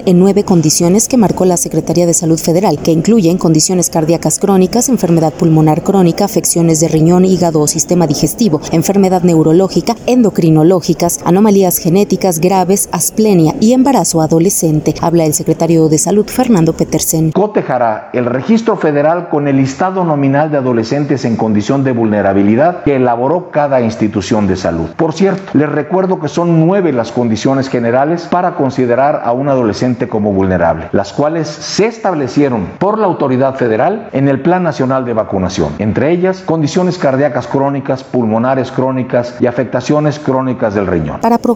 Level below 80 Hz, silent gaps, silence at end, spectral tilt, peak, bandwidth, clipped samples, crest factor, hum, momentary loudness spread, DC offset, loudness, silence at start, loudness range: -42 dBFS; none; 0 s; -5.5 dB/octave; 0 dBFS; 20 kHz; under 0.1%; 10 dB; none; 5 LU; under 0.1%; -11 LUFS; 0 s; 3 LU